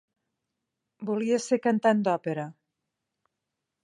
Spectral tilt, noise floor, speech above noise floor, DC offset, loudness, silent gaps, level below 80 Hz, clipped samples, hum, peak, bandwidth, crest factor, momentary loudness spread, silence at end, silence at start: -6 dB/octave; -85 dBFS; 59 dB; under 0.1%; -26 LUFS; none; -82 dBFS; under 0.1%; none; -8 dBFS; 11 kHz; 20 dB; 13 LU; 1.3 s; 1 s